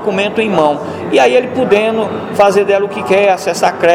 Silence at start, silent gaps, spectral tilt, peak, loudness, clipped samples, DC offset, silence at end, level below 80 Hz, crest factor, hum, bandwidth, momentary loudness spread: 0 s; none; -4.5 dB/octave; 0 dBFS; -12 LUFS; under 0.1%; under 0.1%; 0 s; -54 dBFS; 12 dB; none; 15.5 kHz; 5 LU